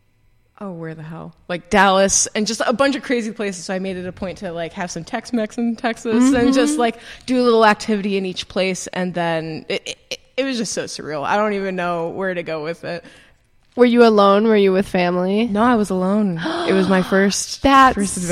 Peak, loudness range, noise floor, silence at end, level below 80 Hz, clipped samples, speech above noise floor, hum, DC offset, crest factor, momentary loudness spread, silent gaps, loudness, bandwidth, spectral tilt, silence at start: 0 dBFS; 7 LU; -57 dBFS; 0 s; -46 dBFS; under 0.1%; 39 dB; none; under 0.1%; 18 dB; 15 LU; none; -18 LUFS; 15 kHz; -4 dB/octave; 0.6 s